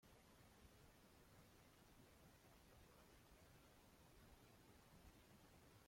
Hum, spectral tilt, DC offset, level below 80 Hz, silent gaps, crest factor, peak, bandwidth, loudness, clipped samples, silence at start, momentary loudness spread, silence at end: none; -4 dB/octave; under 0.1%; -76 dBFS; none; 16 dB; -54 dBFS; 16.5 kHz; -70 LUFS; under 0.1%; 0 s; 1 LU; 0 s